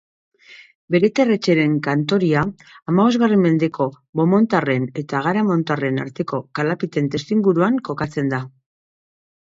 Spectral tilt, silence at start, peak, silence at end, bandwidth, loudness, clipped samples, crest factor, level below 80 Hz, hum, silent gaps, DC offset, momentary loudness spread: -7.5 dB/octave; 0.5 s; -4 dBFS; 0.95 s; 7.8 kHz; -19 LUFS; under 0.1%; 16 dB; -56 dBFS; none; 0.75-0.88 s, 2.82-2.86 s, 4.09-4.13 s; under 0.1%; 9 LU